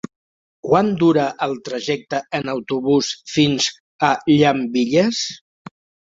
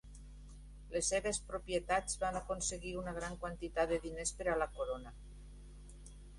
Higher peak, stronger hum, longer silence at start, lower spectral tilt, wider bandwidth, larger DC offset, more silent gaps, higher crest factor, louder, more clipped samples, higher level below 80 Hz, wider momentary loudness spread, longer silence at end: first, -2 dBFS vs -20 dBFS; second, none vs 50 Hz at -55 dBFS; first, 0.65 s vs 0.05 s; first, -5 dB/octave vs -3 dB/octave; second, 7.8 kHz vs 11.5 kHz; neither; first, 3.80-3.99 s vs none; about the same, 18 dB vs 20 dB; first, -19 LUFS vs -38 LUFS; neither; second, -58 dBFS vs -52 dBFS; second, 9 LU vs 21 LU; first, 0.75 s vs 0 s